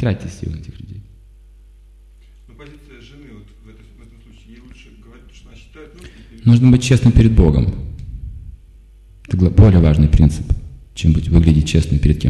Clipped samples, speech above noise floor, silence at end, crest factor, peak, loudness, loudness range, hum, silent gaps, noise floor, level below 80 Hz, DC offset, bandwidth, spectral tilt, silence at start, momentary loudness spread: under 0.1%; 31 dB; 0 s; 16 dB; 0 dBFS; -14 LUFS; 8 LU; none; none; -44 dBFS; -24 dBFS; under 0.1%; 11.5 kHz; -7.5 dB/octave; 0 s; 22 LU